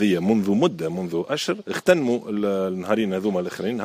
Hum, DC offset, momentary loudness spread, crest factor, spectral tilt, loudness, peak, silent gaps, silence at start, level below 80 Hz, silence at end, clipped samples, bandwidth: none; under 0.1%; 6 LU; 18 dB; -6 dB/octave; -23 LUFS; -4 dBFS; none; 0 s; -64 dBFS; 0 s; under 0.1%; 15.5 kHz